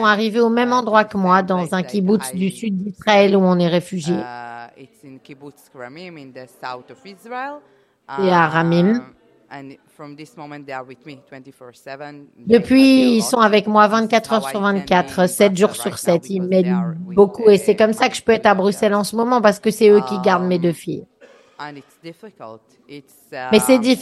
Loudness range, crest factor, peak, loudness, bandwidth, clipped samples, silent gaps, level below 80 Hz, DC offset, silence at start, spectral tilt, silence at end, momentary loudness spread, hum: 15 LU; 18 dB; 0 dBFS; -16 LUFS; 12.5 kHz; under 0.1%; none; -58 dBFS; under 0.1%; 0 s; -5.5 dB/octave; 0 s; 22 LU; none